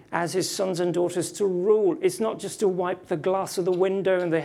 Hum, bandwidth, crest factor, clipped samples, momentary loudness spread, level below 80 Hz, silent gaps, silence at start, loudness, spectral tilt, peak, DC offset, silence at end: none; 15 kHz; 16 dB; under 0.1%; 6 LU; -70 dBFS; none; 0.1 s; -25 LUFS; -5 dB/octave; -8 dBFS; under 0.1%; 0 s